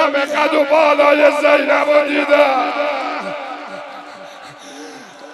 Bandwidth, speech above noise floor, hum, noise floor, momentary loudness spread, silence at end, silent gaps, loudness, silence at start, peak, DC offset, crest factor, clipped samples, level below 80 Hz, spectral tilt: 12.5 kHz; 22 dB; none; -35 dBFS; 23 LU; 0 s; none; -14 LUFS; 0 s; 0 dBFS; under 0.1%; 16 dB; under 0.1%; -70 dBFS; -3 dB/octave